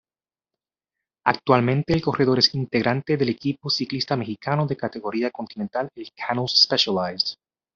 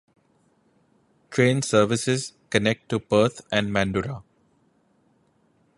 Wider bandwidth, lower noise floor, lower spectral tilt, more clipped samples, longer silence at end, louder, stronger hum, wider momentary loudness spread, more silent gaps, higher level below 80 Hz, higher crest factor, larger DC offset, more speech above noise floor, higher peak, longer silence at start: second, 7.6 kHz vs 11.5 kHz; first, under -90 dBFS vs -64 dBFS; second, -3.5 dB/octave vs -5 dB/octave; neither; second, 0.45 s vs 1.55 s; about the same, -22 LUFS vs -23 LUFS; neither; first, 11 LU vs 8 LU; neither; about the same, -56 dBFS vs -54 dBFS; about the same, 22 dB vs 24 dB; neither; first, over 67 dB vs 42 dB; about the same, -2 dBFS vs -2 dBFS; about the same, 1.25 s vs 1.3 s